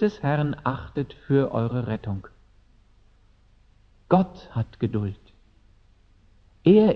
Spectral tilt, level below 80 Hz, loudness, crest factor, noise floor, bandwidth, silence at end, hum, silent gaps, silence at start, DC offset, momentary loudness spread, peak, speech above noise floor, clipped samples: -9.5 dB/octave; -52 dBFS; -25 LUFS; 22 dB; -57 dBFS; 6.2 kHz; 0 s; none; none; 0 s; under 0.1%; 11 LU; -4 dBFS; 34 dB; under 0.1%